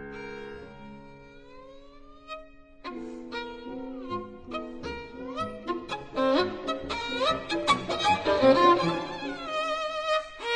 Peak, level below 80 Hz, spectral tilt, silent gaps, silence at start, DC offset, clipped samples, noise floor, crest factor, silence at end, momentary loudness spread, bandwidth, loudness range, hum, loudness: -8 dBFS; -54 dBFS; -4.5 dB/octave; none; 0 s; under 0.1%; under 0.1%; -49 dBFS; 20 dB; 0 s; 21 LU; 10.5 kHz; 17 LU; none; -28 LUFS